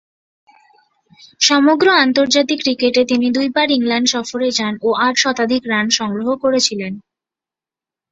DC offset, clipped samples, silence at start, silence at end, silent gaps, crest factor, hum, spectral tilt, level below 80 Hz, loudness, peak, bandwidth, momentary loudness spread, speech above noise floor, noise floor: under 0.1%; under 0.1%; 1.4 s; 1.1 s; none; 16 dB; none; -2.5 dB/octave; -60 dBFS; -15 LUFS; 0 dBFS; 8 kHz; 7 LU; 73 dB; -89 dBFS